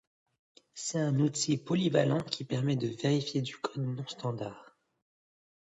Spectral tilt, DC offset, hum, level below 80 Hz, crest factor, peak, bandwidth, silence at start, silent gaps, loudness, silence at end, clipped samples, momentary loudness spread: -5.5 dB/octave; under 0.1%; none; -72 dBFS; 20 dB; -12 dBFS; 8.4 kHz; 0.75 s; none; -32 LUFS; 0.95 s; under 0.1%; 9 LU